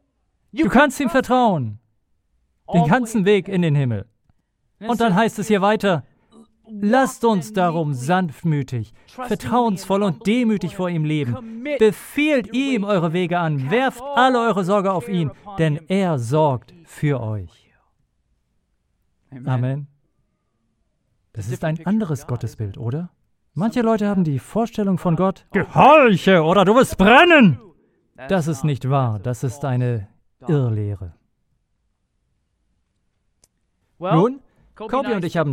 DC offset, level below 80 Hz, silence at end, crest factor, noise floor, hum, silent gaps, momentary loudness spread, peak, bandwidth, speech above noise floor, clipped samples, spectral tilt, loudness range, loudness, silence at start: under 0.1%; -50 dBFS; 0 s; 20 dB; -69 dBFS; none; none; 15 LU; 0 dBFS; 16.5 kHz; 51 dB; under 0.1%; -6.5 dB/octave; 13 LU; -19 LUFS; 0.55 s